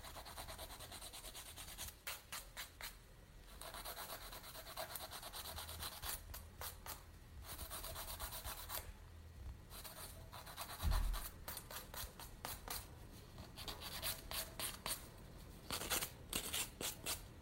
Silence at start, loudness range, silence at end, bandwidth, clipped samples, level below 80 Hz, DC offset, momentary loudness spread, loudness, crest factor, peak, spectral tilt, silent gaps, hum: 0 s; 6 LU; 0 s; 16.5 kHz; under 0.1%; -54 dBFS; under 0.1%; 14 LU; -47 LUFS; 26 dB; -22 dBFS; -2 dB/octave; none; none